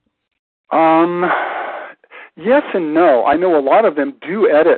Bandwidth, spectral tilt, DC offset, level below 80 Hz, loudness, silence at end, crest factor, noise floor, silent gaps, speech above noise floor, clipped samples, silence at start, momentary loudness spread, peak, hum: 4.4 kHz; -11 dB/octave; under 0.1%; -58 dBFS; -14 LUFS; 0 s; 14 dB; -39 dBFS; none; 26 dB; under 0.1%; 0.7 s; 12 LU; -2 dBFS; none